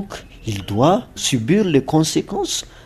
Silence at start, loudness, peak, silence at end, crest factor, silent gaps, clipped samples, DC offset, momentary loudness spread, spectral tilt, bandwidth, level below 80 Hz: 0 s; -18 LUFS; -2 dBFS; 0.05 s; 18 dB; none; under 0.1%; under 0.1%; 12 LU; -5 dB/octave; 14 kHz; -44 dBFS